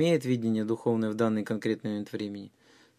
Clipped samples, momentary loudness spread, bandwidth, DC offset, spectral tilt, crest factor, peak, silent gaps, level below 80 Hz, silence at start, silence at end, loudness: under 0.1%; 10 LU; 14 kHz; under 0.1%; -7 dB/octave; 16 dB; -14 dBFS; none; -72 dBFS; 0 s; 0.5 s; -30 LUFS